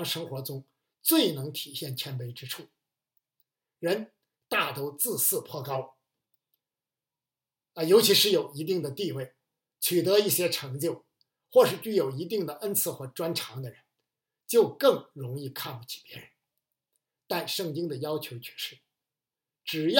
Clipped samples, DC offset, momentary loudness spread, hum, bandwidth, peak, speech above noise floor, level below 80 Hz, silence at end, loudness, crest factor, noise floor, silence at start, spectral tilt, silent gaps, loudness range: under 0.1%; under 0.1%; 17 LU; none; 17 kHz; -4 dBFS; over 62 dB; -84 dBFS; 0 s; -28 LUFS; 26 dB; under -90 dBFS; 0 s; -3.5 dB/octave; none; 9 LU